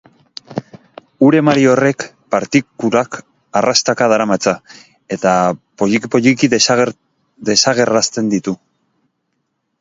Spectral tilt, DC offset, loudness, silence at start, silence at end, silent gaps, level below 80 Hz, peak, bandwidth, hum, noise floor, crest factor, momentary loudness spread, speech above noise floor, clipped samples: -4 dB/octave; under 0.1%; -14 LUFS; 0.5 s; 1.25 s; none; -56 dBFS; 0 dBFS; 7.8 kHz; none; -69 dBFS; 16 dB; 15 LU; 56 dB; under 0.1%